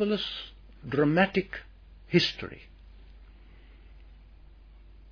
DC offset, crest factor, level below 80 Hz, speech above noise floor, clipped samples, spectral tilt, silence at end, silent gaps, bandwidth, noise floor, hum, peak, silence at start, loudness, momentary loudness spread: under 0.1%; 22 dB; -52 dBFS; 24 dB; under 0.1%; -6 dB/octave; 0.2 s; none; 5.4 kHz; -52 dBFS; none; -10 dBFS; 0 s; -28 LUFS; 21 LU